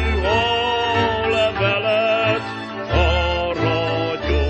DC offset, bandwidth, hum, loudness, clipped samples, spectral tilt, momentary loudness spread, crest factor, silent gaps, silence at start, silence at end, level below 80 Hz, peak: under 0.1%; 8.4 kHz; none; -19 LUFS; under 0.1%; -6 dB/octave; 4 LU; 14 dB; none; 0 s; 0 s; -28 dBFS; -4 dBFS